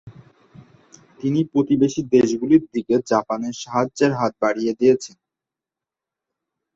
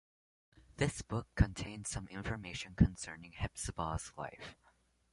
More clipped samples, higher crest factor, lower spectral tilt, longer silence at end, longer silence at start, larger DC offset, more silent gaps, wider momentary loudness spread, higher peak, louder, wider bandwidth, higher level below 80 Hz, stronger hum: neither; second, 18 dB vs 26 dB; about the same, -6.5 dB/octave vs -5.5 dB/octave; first, 1.7 s vs 0.6 s; second, 0.05 s vs 0.8 s; neither; neither; second, 7 LU vs 14 LU; first, -4 dBFS vs -14 dBFS; first, -20 LUFS vs -38 LUFS; second, 8 kHz vs 11.5 kHz; second, -60 dBFS vs -46 dBFS; neither